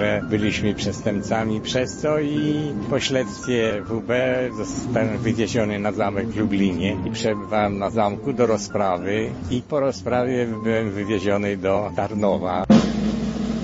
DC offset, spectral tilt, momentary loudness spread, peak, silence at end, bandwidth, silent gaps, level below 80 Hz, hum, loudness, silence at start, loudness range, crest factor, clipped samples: under 0.1%; -6 dB/octave; 4 LU; -4 dBFS; 0 s; 8 kHz; none; -44 dBFS; none; -22 LUFS; 0 s; 2 LU; 18 dB; under 0.1%